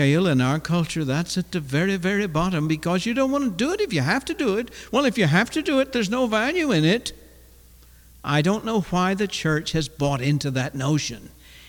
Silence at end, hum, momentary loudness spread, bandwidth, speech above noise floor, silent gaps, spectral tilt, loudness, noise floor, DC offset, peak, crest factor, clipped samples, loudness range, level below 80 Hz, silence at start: 0 s; none; 6 LU; 19.5 kHz; 27 dB; none; -5.5 dB/octave; -23 LUFS; -50 dBFS; under 0.1%; -8 dBFS; 16 dB; under 0.1%; 2 LU; -48 dBFS; 0 s